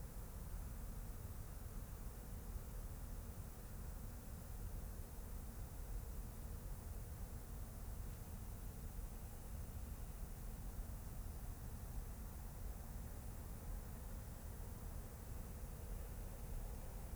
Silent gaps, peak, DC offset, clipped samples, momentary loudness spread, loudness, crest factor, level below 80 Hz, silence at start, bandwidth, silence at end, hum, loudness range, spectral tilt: none; -36 dBFS; under 0.1%; under 0.1%; 2 LU; -52 LUFS; 12 dB; -50 dBFS; 0 s; over 20 kHz; 0 s; none; 0 LU; -5.5 dB/octave